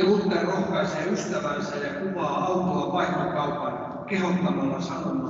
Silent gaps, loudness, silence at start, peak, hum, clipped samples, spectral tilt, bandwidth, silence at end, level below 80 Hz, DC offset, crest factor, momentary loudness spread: none; -26 LUFS; 0 s; -10 dBFS; none; under 0.1%; -6 dB/octave; 7.8 kHz; 0 s; -58 dBFS; under 0.1%; 14 dB; 5 LU